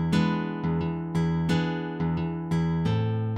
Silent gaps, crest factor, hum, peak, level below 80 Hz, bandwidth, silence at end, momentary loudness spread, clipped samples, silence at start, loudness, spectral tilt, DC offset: none; 14 dB; none; -12 dBFS; -50 dBFS; 9.2 kHz; 0 s; 4 LU; under 0.1%; 0 s; -27 LUFS; -7.5 dB/octave; under 0.1%